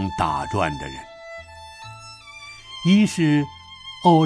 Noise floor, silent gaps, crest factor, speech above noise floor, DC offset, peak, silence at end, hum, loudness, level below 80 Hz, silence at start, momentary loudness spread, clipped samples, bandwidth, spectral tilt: -41 dBFS; none; 18 dB; 21 dB; under 0.1%; -4 dBFS; 0 s; none; -21 LUFS; -48 dBFS; 0 s; 21 LU; under 0.1%; 11 kHz; -6 dB/octave